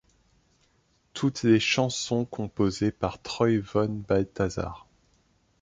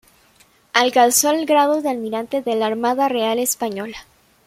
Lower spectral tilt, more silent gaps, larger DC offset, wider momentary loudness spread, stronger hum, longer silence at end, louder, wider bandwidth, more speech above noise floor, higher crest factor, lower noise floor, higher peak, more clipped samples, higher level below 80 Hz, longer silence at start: first, -5.5 dB/octave vs -2 dB/octave; neither; neither; about the same, 11 LU vs 11 LU; neither; first, 0.8 s vs 0.45 s; second, -27 LUFS vs -18 LUFS; second, 9.4 kHz vs 16.5 kHz; first, 41 dB vs 36 dB; about the same, 18 dB vs 18 dB; first, -67 dBFS vs -55 dBFS; second, -8 dBFS vs 0 dBFS; neither; first, -50 dBFS vs -62 dBFS; first, 1.15 s vs 0.75 s